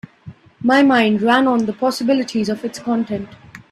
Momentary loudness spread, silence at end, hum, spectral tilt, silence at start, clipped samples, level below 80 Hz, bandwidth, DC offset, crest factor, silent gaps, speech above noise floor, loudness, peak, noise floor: 11 LU; 0.15 s; none; -5 dB/octave; 0.25 s; under 0.1%; -58 dBFS; 13.5 kHz; under 0.1%; 18 dB; none; 24 dB; -17 LUFS; 0 dBFS; -41 dBFS